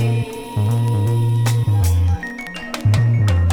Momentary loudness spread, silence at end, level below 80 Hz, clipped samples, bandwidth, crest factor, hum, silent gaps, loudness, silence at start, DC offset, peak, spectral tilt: 9 LU; 0 s; -32 dBFS; under 0.1%; 17.5 kHz; 12 dB; none; none; -18 LUFS; 0 s; under 0.1%; -4 dBFS; -6.5 dB/octave